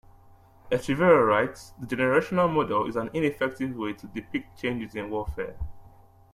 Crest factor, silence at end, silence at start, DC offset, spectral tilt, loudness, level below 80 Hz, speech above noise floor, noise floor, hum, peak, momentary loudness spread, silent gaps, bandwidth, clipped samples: 20 dB; 0.45 s; 0.65 s; under 0.1%; -6.5 dB/octave; -26 LUFS; -48 dBFS; 28 dB; -54 dBFS; none; -6 dBFS; 15 LU; none; 14 kHz; under 0.1%